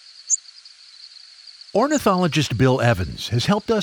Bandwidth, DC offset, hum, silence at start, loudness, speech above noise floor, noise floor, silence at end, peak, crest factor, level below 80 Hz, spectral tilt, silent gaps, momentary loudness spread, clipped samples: over 20 kHz; under 0.1%; none; 0.25 s; -20 LUFS; 27 dB; -46 dBFS; 0 s; -2 dBFS; 18 dB; -46 dBFS; -4.5 dB/octave; none; 22 LU; under 0.1%